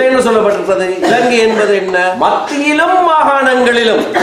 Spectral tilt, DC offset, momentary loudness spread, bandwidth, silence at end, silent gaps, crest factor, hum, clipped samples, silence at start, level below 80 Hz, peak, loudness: -3.5 dB/octave; under 0.1%; 4 LU; 14.5 kHz; 0 s; none; 10 dB; none; under 0.1%; 0 s; -50 dBFS; 0 dBFS; -10 LUFS